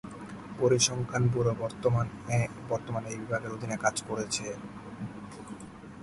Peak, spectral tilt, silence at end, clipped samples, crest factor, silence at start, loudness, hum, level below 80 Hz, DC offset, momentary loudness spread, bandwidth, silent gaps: -10 dBFS; -4.5 dB/octave; 0 s; under 0.1%; 20 dB; 0.05 s; -30 LUFS; none; -56 dBFS; under 0.1%; 17 LU; 11.5 kHz; none